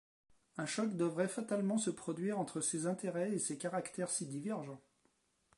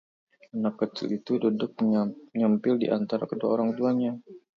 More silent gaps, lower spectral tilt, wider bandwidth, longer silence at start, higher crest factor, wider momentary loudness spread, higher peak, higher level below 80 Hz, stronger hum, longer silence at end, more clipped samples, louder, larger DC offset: neither; second, -4.5 dB/octave vs -8.5 dB/octave; first, 11.5 kHz vs 6.2 kHz; about the same, 0.55 s vs 0.55 s; about the same, 18 dB vs 16 dB; about the same, 7 LU vs 7 LU; second, -22 dBFS vs -12 dBFS; second, -84 dBFS vs -74 dBFS; neither; first, 0.8 s vs 0.2 s; neither; second, -38 LUFS vs -27 LUFS; neither